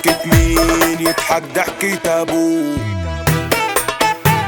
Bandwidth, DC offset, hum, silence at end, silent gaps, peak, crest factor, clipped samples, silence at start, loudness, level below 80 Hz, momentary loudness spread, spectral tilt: 19.5 kHz; under 0.1%; none; 0 s; none; 0 dBFS; 16 dB; under 0.1%; 0 s; -15 LUFS; -28 dBFS; 6 LU; -4.5 dB/octave